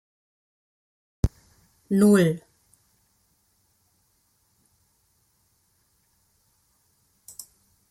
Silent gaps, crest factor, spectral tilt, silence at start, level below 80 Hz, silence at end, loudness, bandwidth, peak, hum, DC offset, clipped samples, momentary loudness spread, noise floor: none; 22 dB; -7 dB/octave; 1.25 s; -46 dBFS; 5.5 s; -22 LUFS; 15.5 kHz; -8 dBFS; none; under 0.1%; under 0.1%; 26 LU; -68 dBFS